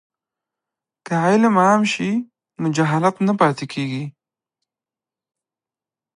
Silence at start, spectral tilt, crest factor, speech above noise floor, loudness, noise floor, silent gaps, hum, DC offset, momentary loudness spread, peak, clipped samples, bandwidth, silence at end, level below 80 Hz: 1.1 s; -6 dB/octave; 20 dB; over 72 dB; -18 LUFS; under -90 dBFS; none; none; under 0.1%; 11 LU; -2 dBFS; under 0.1%; 10.5 kHz; 2.1 s; -68 dBFS